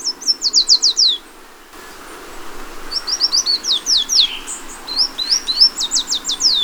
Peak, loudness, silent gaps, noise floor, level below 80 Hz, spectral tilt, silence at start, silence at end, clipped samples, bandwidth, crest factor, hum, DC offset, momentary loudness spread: 0 dBFS; -14 LUFS; none; -40 dBFS; -42 dBFS; 2 dB/octave; 0 s; 0 s; under 0.1%; over 20 kHz; 18 dB; none; under 0.1%; 23 LU